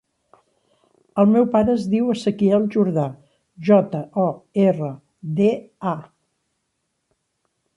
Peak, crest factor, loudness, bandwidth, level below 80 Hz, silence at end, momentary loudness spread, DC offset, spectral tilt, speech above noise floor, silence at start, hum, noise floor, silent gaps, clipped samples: -4 dBFS; 18 dB; -20 LUFS; 9.6 kHz; -58 dBFS; 1.75 s; 11 LU; under 0.1%; -8.5 dB/octave; 55 dB; 1.15 s; none; -74 dBFS; none; under 0.1%